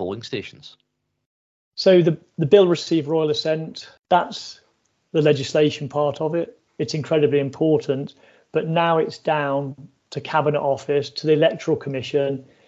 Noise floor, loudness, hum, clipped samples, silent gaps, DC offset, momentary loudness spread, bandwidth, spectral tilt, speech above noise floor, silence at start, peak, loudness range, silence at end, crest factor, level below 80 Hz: -66 dBFS; -21 LUFS; none; under 0.1%; 1.26-1.72 s; under 0.1%; 15 LU; 8 kHz; -6.5 dB/octave; 46 dB; 0 s; -2 dBFS; 3 LU; 0.25 s; 20 dB; -64 dBFS